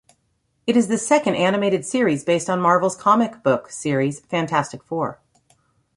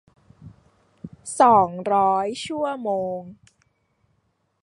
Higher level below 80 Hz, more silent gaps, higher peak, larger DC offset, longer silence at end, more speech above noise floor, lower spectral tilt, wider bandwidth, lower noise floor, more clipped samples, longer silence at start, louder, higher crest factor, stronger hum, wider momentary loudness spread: about the same, -62 dBFS vs -62 dBFS; neither; about the same, -2 dBFS vs -4 dBFS; neither; second, 0.8 s vs 1.3 s; about the same, 49 dB vs 49 dB; about the same, -5 dB/octave vs -5 dB/octave; about the same, 11.5 kHz vs 11.5 kHz; about the same, -68 dBFS vs -70 dBFS; neither; first, 0.65 s vs 0.45 s; about the same, -20 LUFS vs -21 LUFS; about the same, 18 dB vs 20 dB; neither; second, 9 LU vs 21 LU